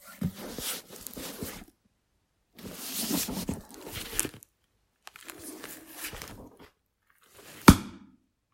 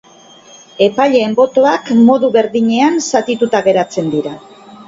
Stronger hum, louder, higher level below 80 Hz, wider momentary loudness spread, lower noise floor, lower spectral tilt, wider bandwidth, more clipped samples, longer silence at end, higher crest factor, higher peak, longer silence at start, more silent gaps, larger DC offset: neither; second, -29 LUFS vs -12 LUFS; first, -46 dBFS vs -56 dBFS; first, 25 LU vs 8 LU; first, -74 dBFS vs -41 dBFS; about the same, -4.5 dB/octave vs -5 dB/octave; first, 16.5 kHz vs 7.8 kHz; neither; first, 0.55 s vs 0.05 s; first, 32 dB vs 12 dB; about the same, 0 dBFS vs 0 dBFS; second, 0.05 s vs 0.8 s; neither; neither